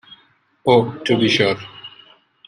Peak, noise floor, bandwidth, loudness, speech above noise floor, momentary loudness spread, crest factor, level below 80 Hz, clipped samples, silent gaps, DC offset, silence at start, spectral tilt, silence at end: -2 dBFS; -58 dBFS; 10.5 kHz; -17 LUFS; 41 dB; 21 LU; 18 dB; -58 dBFS; under 0.1%; none; under 0.1%; 0.65 s; -5.5 dB/octave; 0.6 s